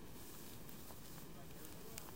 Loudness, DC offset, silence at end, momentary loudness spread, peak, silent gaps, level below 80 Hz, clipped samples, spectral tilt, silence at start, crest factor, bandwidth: -54 LUFS; 0.2%; 0 s; 3 LU; -28 dBFS; none; -66 dBFS; under 0.1%; -4 dB/octave; 0 s; 28 dB; 16.5 kHz